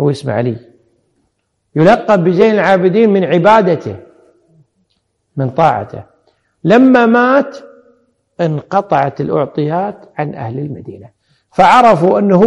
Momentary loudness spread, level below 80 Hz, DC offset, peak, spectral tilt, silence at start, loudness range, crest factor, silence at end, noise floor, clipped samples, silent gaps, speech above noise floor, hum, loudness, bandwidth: 16 LU; -52 dBFS; under 0.1%; 0 dBFS; -7.5 dB/octave; 0 s; 6 LU; 12 dB; 0 s; -65 dBFS; under 0.1%; none; 54 dB; none; -12 LUFS; 11 kHz